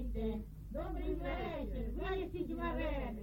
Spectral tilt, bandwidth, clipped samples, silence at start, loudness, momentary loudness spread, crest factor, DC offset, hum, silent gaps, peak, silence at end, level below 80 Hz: -8 dB/octave; 16.5 kHz; under 0.1%; 0 s; -41 LUFS; 5 LU; 14 dB; under 0.1%; none; none; -26 dBFS; 0 s; -44 dBFS